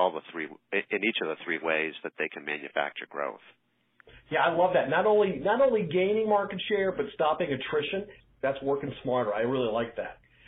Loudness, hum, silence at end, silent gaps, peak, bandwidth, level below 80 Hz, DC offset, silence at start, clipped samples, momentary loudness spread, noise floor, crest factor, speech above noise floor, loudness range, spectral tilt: -28 LUFS; none; 0.35 s; none; -10 dBFS; 4 kHz; -64 dBFS; under 0.1%; 0 s; under 0.1%; 11 LU; -59 dBFS; 18 dB; 31 dB; 6 LU; -3 dB/octave